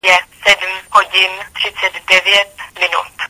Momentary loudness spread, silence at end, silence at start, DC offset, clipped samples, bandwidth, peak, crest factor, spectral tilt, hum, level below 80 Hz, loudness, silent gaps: 9 LU; 0.05 s; 0.05 s; under 0.1%; 0.1%; 16 kHz; 0 dBFS; 14 dB; 0.5 dB/octave; none; -52 dBFS; -12 LUFS; none